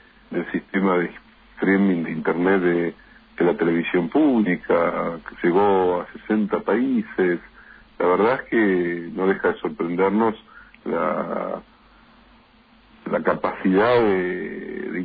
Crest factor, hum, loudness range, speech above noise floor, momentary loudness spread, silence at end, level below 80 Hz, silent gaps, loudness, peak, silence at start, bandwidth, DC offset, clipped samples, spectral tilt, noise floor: 16 dB; none; 5 LU; 33 dB; 10 LU; 0 s; -56 dBFS; none; -22 LUFS; -6 dBFS; 0.3 s; 4.9 kHz; under 0.1%; under 0.1%; -10.5 dB/octave; -54 dBFS